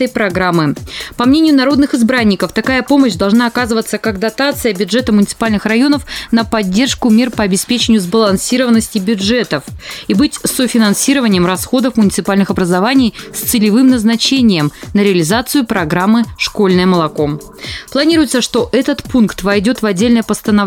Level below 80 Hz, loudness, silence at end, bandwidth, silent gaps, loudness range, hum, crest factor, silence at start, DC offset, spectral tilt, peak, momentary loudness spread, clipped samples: -38 dBFS; -12 LUFS; 0 s; 17.5 kHz; none; 2 LU; none; 12 dB; 0 s; under 0.1%; -4.5 dB/octave; 0 dBFS; 6 LU; under 0.1%